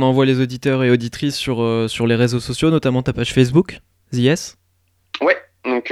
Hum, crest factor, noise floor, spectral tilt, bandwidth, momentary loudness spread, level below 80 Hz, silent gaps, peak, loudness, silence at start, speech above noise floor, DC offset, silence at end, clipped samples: none; 16 dB; -62 dBFS; -6 dB/octave; 13.5 kHz; 7 LU; -46 dBFS; none; 0 dBFS; -18 LUFS; 0 s; 46 dB; under 0.1%; 0 s; under 0.1%